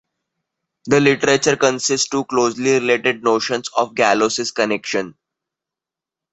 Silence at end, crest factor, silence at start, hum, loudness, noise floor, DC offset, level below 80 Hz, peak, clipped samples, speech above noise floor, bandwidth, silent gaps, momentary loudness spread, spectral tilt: 1.25 s; 18 dB; 0.85 s; none; -17 LUFS; -87 dBFS; under 0.1%; -60 dBFS; 0 dBFS; under 0.1%; 70 dB; 8.2 kHz; none; 6 LU; -3.5 dB/octave